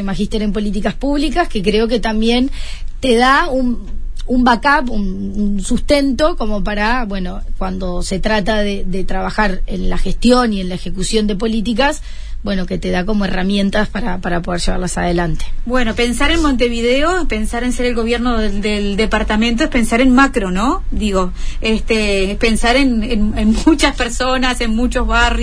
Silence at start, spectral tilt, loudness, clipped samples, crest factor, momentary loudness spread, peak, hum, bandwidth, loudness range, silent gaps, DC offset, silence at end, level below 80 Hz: 0 s; -5 dB/octave; -16 LUFS; under 0.1%; 14 dB; 9 LU; 0 dBFS; none; 11 kHz; 3 LU; none; under 0.1%; 0 s; -20 dBFS